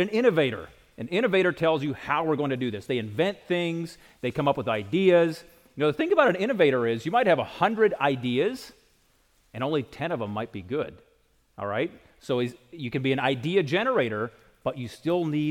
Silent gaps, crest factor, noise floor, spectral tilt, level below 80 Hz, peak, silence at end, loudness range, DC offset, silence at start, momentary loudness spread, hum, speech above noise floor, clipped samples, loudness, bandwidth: none; 20 dB; -64 dBFS; -6.5 dB/octave; -62 dBFS; -6 dBFS; 0 s; 8 LU; under 0.1%; 0 s; 12 LU; none; 39 dB; under 0.1%; -26 LUFS; 16 kHz